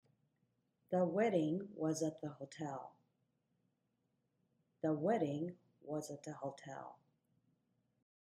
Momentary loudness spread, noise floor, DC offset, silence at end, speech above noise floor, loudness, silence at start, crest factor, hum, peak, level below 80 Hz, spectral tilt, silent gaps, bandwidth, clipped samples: 16 LU; -84 dBFS; under 0.1%; 1.35 s; 44 dB; -40 LUFS; 0.9 s; 20 dB; none; -22 dBFS; -86 dBFS; -6.5 dB/octave; none; 12.5 kHz; under 0.1%